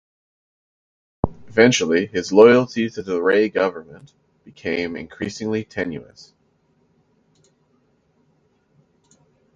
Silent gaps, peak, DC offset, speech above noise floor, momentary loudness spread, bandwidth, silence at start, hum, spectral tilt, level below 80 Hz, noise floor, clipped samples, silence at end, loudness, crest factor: none; 0 dBFS; under 0.1%; 44 dB; 16 LU; 7.8 kHz; 1.25 s; none; -5 dB/octave; -48 dBFS; -63 dBFS; under 0.1%; 3.55 s; -19 LUFS; 22 dB